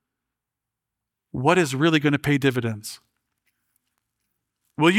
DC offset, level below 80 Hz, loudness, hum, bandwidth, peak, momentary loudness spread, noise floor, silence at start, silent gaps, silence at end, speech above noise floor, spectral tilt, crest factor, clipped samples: under 0.1%; -60 dBFS; -21 LUFS; none; 16 kHz; -4 dBFS; 17 LU; -85 dBFS; 1.35 s; none; 0 s; 64 dB; -5.5 dB/octave; 20 dB; under 0.1%